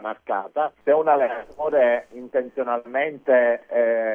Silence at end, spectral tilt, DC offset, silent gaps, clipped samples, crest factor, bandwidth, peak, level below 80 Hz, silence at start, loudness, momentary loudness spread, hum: 0 s; -6.5 dB/octave; under 0.1%; none; under 0.1%; 16 dB; 3.5 kHz; -6 dBFS; -66 dBFS; 0 s; -22 LUFS; 9 LU; none